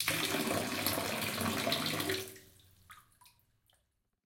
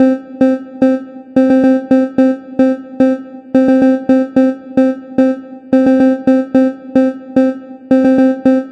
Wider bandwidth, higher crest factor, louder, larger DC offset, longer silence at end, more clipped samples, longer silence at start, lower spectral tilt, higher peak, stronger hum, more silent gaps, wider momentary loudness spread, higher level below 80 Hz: first, 17 kHz vs 6 kHz; first, 24 dB vs 10 dB; second, -34 LUFS vs -13 LUFS; neither; first, 1.25 s vs 0 s; neither; about the same, 0 s vs 0 s; second, -3 dB/octave vs -7.5 dB/octave; second, -12 dBFS vs 0 dBFS; neither; neither; about the same, 6 LU vs 5 LU; second, -68 dBFS vs -54 dBFS